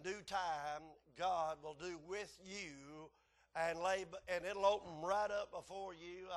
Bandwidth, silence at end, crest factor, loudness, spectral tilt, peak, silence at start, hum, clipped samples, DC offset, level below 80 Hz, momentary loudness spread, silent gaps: 12.5 kHz; 0 s; 20 dB; -43 LUFS; -3.5 dB/octave; -22 dBFS; 0 s; none; under 0.1%; under 0.1%; -72 dBFS; 14 LU; none